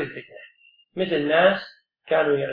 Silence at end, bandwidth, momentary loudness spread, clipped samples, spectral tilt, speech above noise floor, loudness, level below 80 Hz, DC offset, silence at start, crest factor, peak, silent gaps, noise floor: 0 s; 5.2 kHz; 20 LU; under 0.1%; -8 dB/octave; 35 dB; -22 LUFS; -68 dBFS; under 0.1%; 0 s; 20 dB; -4 dBFS; none; -57 dBFS